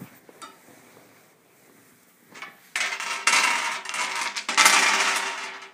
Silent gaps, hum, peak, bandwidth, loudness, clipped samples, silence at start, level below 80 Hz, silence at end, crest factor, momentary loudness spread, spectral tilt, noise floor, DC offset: none; none; 0 dBFS; 15.5 kHz; -21 LUFS; under 0.1%; 0 s; -86 dBFS; 0.05 s; 26 dB; 17 LU; 1.5 dB/octave; -57 dBFS; under 0.1%